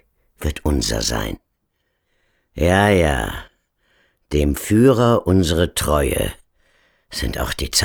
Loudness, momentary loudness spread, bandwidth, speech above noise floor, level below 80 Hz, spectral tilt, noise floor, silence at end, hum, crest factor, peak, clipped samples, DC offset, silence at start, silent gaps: -18 LUFS; 14 LU; 19.5 kHz; 53 dB; -30 dBFS; -5 dB/octave; -71 dBFS; 0 s; none; 16 dB; -2 dBFS; under 0.1%; under 0.1%; 0.4 s; none